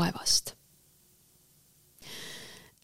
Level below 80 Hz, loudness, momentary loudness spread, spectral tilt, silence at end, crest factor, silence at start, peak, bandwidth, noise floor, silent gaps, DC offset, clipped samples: -62 dBFS; -29 LUFS; 22 LU; -2 dB/octave; 0.15 s; 24 dB; 0 s; -12 dBFS; 16 kHz; -63 dBFS; none; under 0.1%; under 0.1%